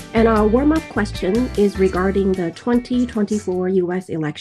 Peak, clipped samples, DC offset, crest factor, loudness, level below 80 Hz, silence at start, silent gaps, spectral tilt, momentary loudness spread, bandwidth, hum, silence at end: -2 dBFS; under 0.1%; under 0.1%; 16 dB; -19 LUFS; -34 dBFS; 0 s; none; -7 dB/octave; 7 LU; 13 kHz; none; 0 s